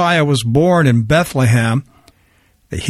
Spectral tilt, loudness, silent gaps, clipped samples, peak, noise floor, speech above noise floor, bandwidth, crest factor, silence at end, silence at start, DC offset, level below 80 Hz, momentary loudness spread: -6 dB/octave; -14 LUFS; none; under 0.1%; -2 dBFS; -55 dBFS; 42 dB; 14.5 kHz; 12 dB; 0 s; 0 s; under 0.1%; -40 dBFS; 7 LU